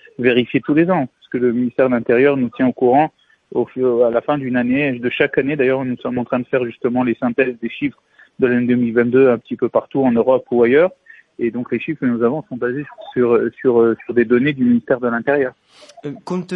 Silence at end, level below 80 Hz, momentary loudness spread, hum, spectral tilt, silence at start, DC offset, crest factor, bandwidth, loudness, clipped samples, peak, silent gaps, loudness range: 0 s; -58 dBFS; 9 LU; none; -8.5 dB/octave; 0.2 s; under 0.1%; 14 dB; 5.2 kHz; -17 LUFS; under 0.1%; -2 dBFS; none; 3 LU